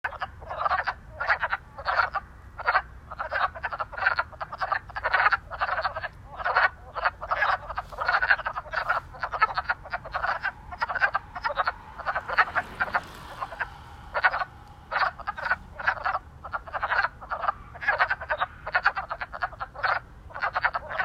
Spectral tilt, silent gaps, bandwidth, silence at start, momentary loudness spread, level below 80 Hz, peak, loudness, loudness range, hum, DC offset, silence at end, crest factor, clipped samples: -4 dB/octave; none; 15 kHz; 0.05 s; 11 LU; -50 dBFS; -6 dBFS; -28 LUFS; 3 LU; none; under 0.1%; 0 s; 22 dB; under 0.1%